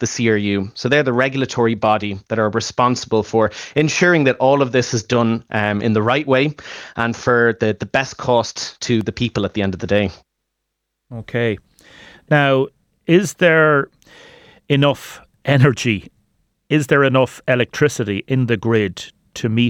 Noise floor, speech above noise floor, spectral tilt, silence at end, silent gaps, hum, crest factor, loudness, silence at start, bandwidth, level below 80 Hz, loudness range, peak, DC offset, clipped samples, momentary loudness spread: -76 dBFS; 59 dB; -5.5 dB/octave; 0 s; none; none; 16 dB; -17 LUFS; 0 s; 15.5 kHz; -52 dBFS; 5 LU; -2 dBFS; under 0.1%; under 0.1%; 10 LU